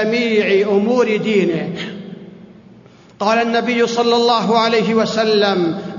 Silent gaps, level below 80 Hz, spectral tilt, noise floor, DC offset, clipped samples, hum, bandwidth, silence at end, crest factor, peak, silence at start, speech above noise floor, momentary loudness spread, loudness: none; -62 dBFS; -5 dB/octave; -44 dBFS; under 0.1%; under 0.1%; none; 7.4 kHz; 0 s; 14 dB; -2 dBFS; 0 s; 28 dB; 11 LU; -15 LUFS